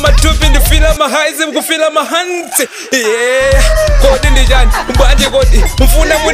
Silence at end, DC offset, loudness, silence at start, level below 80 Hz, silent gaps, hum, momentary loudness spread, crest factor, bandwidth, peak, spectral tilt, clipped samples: 0 s; under 0.1%; -10 LUFS; 0 s; -10 dBFS; none; none; 4 LU; 8 dB; 16 kHz; 0 dBFS; -3.5 dB/octave; 0.6%